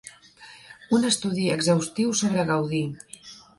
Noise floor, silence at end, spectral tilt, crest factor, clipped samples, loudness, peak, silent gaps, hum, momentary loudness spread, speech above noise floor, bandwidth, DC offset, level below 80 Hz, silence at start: -49 dBFS; 0.2 s; -4.5 dB/octave; 18 dB; under 0.1%; -24 LUFS; -8 dBFS; none; none; 20 LU; 26 dB; 11.5 kHz; under 0.1%; -62 dBFS; 0.05 s